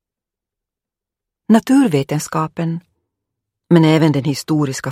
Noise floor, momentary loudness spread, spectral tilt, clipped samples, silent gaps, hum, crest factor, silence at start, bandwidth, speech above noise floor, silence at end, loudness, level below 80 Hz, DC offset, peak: -86 dBFS; 10 LU; -6.5 dB/octave; under 0.1%; none; none; 16 dB; 1.5 s; 15.5 kHz; 72 dB; 0 s; -16 LUFS; -60 dBFS; under 0.1%; 0 dBFS